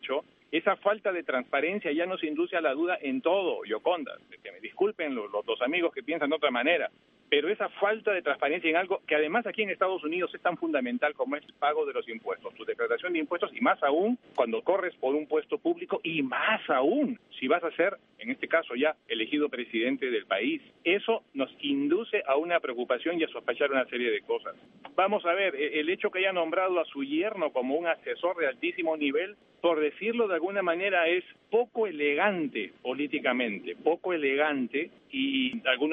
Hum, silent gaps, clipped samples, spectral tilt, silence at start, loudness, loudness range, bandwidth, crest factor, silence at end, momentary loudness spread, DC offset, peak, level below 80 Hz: none; none; under 0.1%; -7.5 dB/octave; 0.05 s; -29 LUFS; 2 LU; 4 kHz; 20 dB; 0 s; 7 LU; under 0.1%; -8 dBFS; -82 dBFS